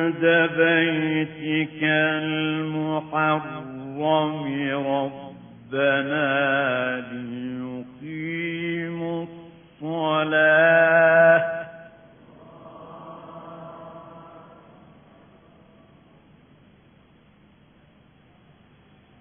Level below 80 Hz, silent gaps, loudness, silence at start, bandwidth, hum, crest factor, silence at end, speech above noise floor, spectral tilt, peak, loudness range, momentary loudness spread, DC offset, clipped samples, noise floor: -66 dBFS; none; -22 LUFS; 0 s; 3.6 kHz; none; 18 dB; 4.8 s; 33 dB; -1 dB/octave; -6 dBFS; 23 LU; 25 LU; under 0.1%; under 0.1%; -55 dBFS